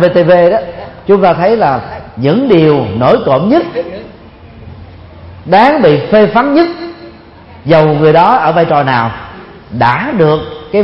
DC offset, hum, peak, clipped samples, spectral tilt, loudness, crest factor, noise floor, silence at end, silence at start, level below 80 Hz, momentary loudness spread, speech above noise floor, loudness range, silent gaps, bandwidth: under 0.1%; none; 0 dBFS; 0.2%; -9 dB/octave; -9 LUFS; 10 dB; -34 dBFS; 0 s; 0 s; -40 dBFS; 17 LU; 26 dB; 3 LU; none; 5.8 kHz